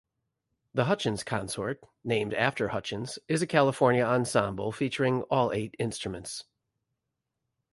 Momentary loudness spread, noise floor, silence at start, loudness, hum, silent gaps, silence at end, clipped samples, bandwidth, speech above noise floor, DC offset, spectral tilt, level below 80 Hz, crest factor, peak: 11 LU; -84 dBFS; 0.75 s; -29 LUFS; none; none; 1.3 s; under 0.1%; 11.5 kHz; 56 dB; under 0.1%; -5 dB/octave; -60 dBFS; 20 dB; -10 dBFS